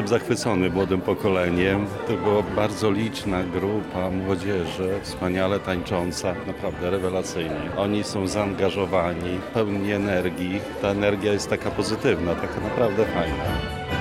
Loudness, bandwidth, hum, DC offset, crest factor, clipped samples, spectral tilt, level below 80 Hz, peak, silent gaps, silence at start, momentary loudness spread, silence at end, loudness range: -24 LUFS; 16 kHz; none; under 0.1%; 16 dB; under 0.1%; -5.5 dB/octave; -44 dBFS; -8 dBFS; none; 0 s; 5 LU; 0 s; 3 LU